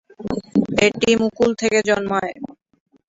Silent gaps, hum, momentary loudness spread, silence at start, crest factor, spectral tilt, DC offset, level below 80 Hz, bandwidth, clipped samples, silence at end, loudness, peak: none; none; 12 LU; 0.2 s; 18 dB; -4.5 dB/octave; under 0.1%; -52 dBFS; 8 kHz; under 0.1%; 0.55 s; -19 LUFS; -2 dBFS